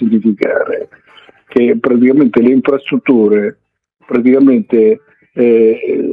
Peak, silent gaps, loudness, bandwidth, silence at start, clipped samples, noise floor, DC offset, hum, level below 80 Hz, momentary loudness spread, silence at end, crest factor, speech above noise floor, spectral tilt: 0 dBFS; none; -11 LUFS; 4.4 kHz; 0 s; under 0.1%; -40 dBFS; under 0.1%; none; -58 dBFS; 10 LU; 0 s; 12 dB; 30 dB; -9.5 dB/octave